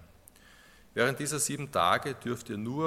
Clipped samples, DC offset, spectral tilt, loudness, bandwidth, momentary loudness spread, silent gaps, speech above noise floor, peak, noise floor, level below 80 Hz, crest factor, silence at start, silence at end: under 0.1%; under 0.1%; -3.5 dB/octave; -30 LUFS; 16.5 kHz; 9 LU; none; 27 dB; -10 dBFS; -57 dBFS; -64 dBFS; 22 dB; 0 s; 0 s